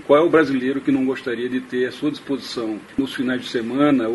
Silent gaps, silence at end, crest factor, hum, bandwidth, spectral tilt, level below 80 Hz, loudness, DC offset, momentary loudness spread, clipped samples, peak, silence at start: none; 0 s; 18 dB; none; 11.5 kHz; -6 dB/octave; -58 dBFS; -21 LUFS; under 0.1%; 10 LU; under 0.1%; -2 dBFS; 0 s